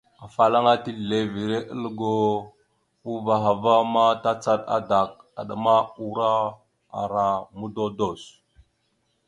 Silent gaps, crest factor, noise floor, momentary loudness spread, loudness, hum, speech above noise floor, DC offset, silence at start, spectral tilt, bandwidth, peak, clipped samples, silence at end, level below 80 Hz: none; 20 dB; -71 dBFS; 13 LU; -23 LUFS; none; 48 dB; under 0.1%; 0.2 s; -6 dB/octave; 10.5 kHz; -4 dBFS; under 0.1%; 1 s; -60 dBFS